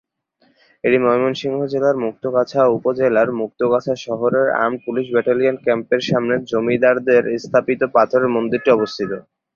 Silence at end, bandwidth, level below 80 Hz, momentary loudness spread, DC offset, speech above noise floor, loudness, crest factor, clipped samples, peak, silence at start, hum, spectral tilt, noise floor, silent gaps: 0.35 s; 7.2 kHz; -60 dBFS; 6 LU; under 0.1%; 44 dB; -18 LUFS; 16 dB; under 0.1%; -2 dBFS; 0.85 s; none; -6.5 dB/octave; -61 dBFS; none